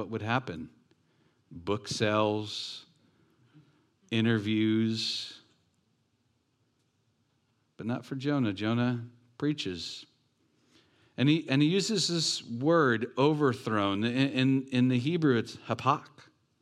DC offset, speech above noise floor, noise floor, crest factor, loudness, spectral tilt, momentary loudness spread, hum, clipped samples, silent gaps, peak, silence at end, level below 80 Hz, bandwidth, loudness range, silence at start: under 0.1%; 45 dB; -74 dBFS; 20 dB; -29 LUFS; -5.5 dB/octave; 13 LU; none; under 0.1%; none; -10 dBFS; 0.55 s; -74 dBFS; 12.5 kHz; 8 LU; 0 s